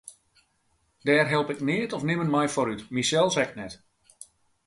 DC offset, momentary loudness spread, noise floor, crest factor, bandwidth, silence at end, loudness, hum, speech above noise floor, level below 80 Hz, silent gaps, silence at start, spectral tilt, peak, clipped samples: under 0.1%; 9 LU; -70 dBFS; 20 dB; 11.5 kHz; 0.9 s; -25 LUFS; none; 45 dB; -64 dBFS; none; 0.05 s; -4.5 dB/octave; -6 dBFS; under 0.1%